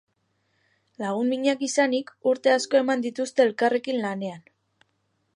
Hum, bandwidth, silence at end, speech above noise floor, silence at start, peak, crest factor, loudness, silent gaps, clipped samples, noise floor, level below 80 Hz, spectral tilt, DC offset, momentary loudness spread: none; 11 kHz; 0.95 s; 49 dB; 1 s; -6 dBFS; 20 dB; -24 LUFS; none; under 0.1%; -72 dBFS; -80 dBFS; -4 dB/octave; under 0.1%; 9 LU